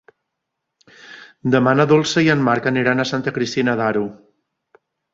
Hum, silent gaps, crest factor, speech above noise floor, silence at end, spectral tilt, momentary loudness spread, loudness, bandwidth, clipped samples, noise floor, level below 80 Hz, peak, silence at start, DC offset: none; none; 18 dB; 62 dB; 1 s; -5.5 dB/octave; 10 LU; -17 LUFS; 7.8 kHz; under 0.1%; -79 dBFS; -58 dBFS; -2 dBFS; 1.05 s; under 0.1%